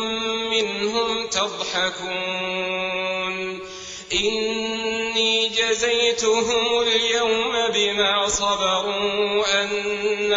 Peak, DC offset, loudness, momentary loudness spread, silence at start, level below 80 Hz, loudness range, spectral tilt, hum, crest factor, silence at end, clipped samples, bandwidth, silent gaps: -6 dBFS; under 0.1%; -21 LUFS; 6 LU; 0 s; -52 dBFS; 5 LU; -1.5 dB/octave; none; 16 dB; 0 s; under 0.1%; 7.8 kHz; none